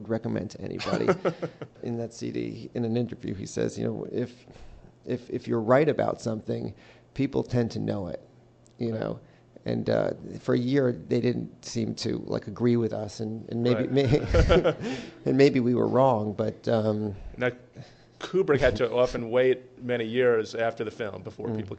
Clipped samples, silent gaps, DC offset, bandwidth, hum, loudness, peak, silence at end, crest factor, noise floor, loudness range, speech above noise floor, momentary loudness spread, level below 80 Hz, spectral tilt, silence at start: under 0.1%; none; under 0.1%; 8.8 kHz; none; -27 LUFS; -6 dBFS; 0 s; 20 dB; -56 dBFS; 8 LU; 30 dB; 13 LU; -42 dBFS; -7 dB/octave; 0 s